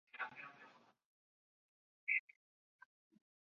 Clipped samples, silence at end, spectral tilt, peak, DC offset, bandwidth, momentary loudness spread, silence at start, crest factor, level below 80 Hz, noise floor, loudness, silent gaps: under 0.1%; 1.25 s; 1 dB/octave; -26 dBFS; under 0.1%; 7 kHz; 23 LU; 0.15 s; 26 dB; under -90 dBFS; -66 dBFS; -42 LUFS; 1.05-2.07 s